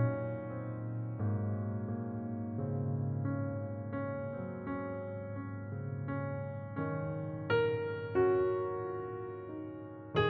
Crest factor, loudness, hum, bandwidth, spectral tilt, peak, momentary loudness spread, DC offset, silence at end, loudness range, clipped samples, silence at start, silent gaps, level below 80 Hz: 18 dB; -37 LUFS; none; 5 kHz; -7 dB/octave; -18 dBFS; 10 LU; under 0.1%; 0 s; 5 LU; under 0.1%; 0 s; none; -64 dBFS